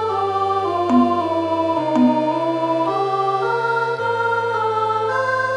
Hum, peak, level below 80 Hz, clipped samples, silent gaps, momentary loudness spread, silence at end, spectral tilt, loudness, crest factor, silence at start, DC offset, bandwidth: none; -4 dBFS; -64 dBFS; under 0.1%; none; 4 LU; 0 s; -6.5 dB/octave; -19 LUFS; 16 dB; 0 s; under 0.1%; 10.5 kHz